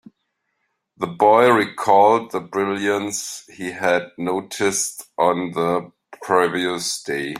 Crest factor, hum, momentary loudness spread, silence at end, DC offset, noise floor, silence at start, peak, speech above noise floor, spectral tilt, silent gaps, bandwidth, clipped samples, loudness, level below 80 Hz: 18 dB; none; 13 LU; 0 s; under 0.1%; -74 dBFS; 1 s; -2 dBFS; 54 dB; -3.5 dB/octave; none; 16 kHz; under 0.1%; -19 LUFS; -64 dBFS